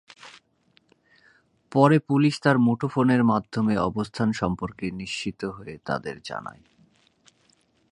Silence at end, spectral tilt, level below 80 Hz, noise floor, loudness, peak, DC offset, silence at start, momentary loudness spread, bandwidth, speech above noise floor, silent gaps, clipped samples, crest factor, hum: 1.4 s; -7 dB/octave; -56 dBFS; -64 dBFS; -24 LUFS; -2 dBFS; under 0.1%; 0.25 s; 15 LU; 11 kHz; 41 dB; none; under 0.1%; 22 dB; none